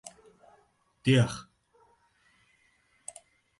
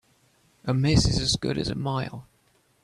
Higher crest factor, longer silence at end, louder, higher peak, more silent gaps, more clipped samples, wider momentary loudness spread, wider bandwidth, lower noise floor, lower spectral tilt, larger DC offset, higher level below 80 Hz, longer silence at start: about the same, 22 dB vs 20 dB; first, 2.2 s vs 0.6 s; about the same, -27 LUFS vs -25 LUFS; second, -12 dBFS vs -8 dBFS; neither; neither; first, 22 LU vs 15 LU; about the same, 11.5 kHz vs 12.5 kHz; about the same, -68 dBFS vs -65 dBFS; about the same, -6 dB/octave vs -5 dB/octave; neither; second, -62 dBFS vs -40 dBFS; second, 0.05 s vs 0.65 s